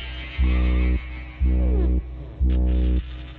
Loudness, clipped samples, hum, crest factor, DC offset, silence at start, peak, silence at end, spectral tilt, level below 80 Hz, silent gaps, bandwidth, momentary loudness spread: -24 LUFS; under 0.1%; none; 10 dB; under 0.1%; 0 s; -12 dBFS; 0 s; -10 dB/octave; -22 dBFS; none; 4.2 kHz; 7 LU